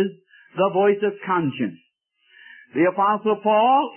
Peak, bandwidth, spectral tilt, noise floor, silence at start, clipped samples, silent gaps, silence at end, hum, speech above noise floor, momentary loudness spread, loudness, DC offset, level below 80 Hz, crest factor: -6 dBFS; 3.3 kHz; -11 dB/octave; -65 dBFS; 0 s; under 0.1%; none; 0 s; none; 45 dB; 12 LU; -21 LUFS; under 0.1%; -74 dBFS; 14 dB